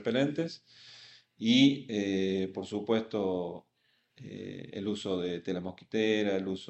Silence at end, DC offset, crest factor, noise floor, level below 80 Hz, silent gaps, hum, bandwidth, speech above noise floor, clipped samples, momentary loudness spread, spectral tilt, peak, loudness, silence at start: 0 s; under 0.1%; 20 dB; -72 dBFS; -74 dBFS; none; none; 8.4 kHz; 41 dB; under 0.1%; 22 LU; -5.5 dB/octave; -12 dBFS; -31 LUFS; 0 s